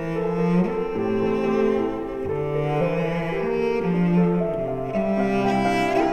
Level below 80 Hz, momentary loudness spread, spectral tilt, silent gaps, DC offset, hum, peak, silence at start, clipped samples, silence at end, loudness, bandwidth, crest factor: -44 dBFS; 5 LU; -8 dB/octave; none; under 0.1%; none; -10 dBFS; 0 s; under 0.1%; 0 s; -23 LUFS; 8.8 kHz; 12 dB